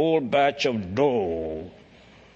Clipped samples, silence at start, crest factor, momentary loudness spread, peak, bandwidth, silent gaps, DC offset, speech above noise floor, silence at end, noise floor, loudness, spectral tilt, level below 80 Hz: under 0.1%; 0 s; 16 dB; 14 LU; -8 dBFS; 7.8 kHz; none; under 0.1%; 28 dB; 0.65 s; -51 dBFS; -24 LUFS; -6 dB/octave; -54 dBFS